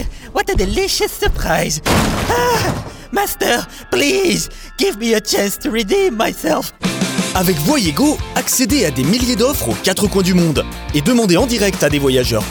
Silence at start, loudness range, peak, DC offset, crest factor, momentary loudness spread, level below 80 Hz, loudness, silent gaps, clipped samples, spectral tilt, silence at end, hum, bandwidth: 0 s; 2 LU; -2 dBFS; under 0.1%; 14 dB; 6 LU; -30 dBFS; -15 LUFS; none; under 0.1%; -4 dB/octave; 0 s; none; over 20 kHz